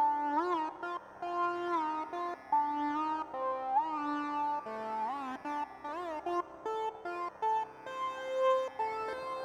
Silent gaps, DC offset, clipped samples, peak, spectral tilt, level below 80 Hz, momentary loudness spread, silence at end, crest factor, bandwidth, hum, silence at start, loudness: none; under 0.1%; under 0.1%; -20 dBFS; -4.5 dB/octave; -74 dBFS; 8 LU; 0 s; 16 dB; 11 kHz; none; 0 s; -35 LUFS